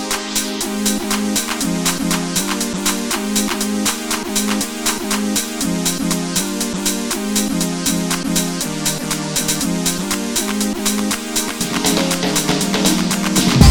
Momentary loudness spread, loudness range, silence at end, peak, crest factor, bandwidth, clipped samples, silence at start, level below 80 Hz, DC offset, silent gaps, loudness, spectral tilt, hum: 4 LU; 1 LU; 0 s; 0 dBFS; 18 dB; over 20 kHz; under 0.1%; 0 s; -34 dBFS; under 0.1%; none; -18 LUFS; -3.5 dB/octave; none